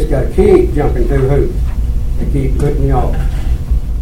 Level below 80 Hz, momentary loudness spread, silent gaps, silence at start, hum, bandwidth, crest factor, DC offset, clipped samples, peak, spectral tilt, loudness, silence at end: -14 dBFS; 9 LU; none; 0 s; none; 13 kHz; 12 dB; under 0.1%; 0.1%; 0 dBFS; -8.5 dB/octave; -14 LUFS; 0 s